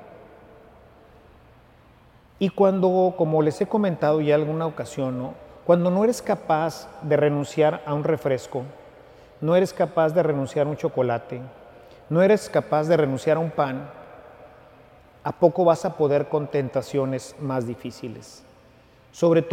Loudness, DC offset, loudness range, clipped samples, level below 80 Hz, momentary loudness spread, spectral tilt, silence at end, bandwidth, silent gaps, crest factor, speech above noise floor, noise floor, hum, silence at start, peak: -23 LUFS; under 0.1%; 3 LU; under 0.1%; -60 dBFS; 14 LU; -7 dB/octave; 0 s; 15.5 kHz; none; 20 dB; 31 dB; -53 dBFS; none; 0 s; -2 dBFS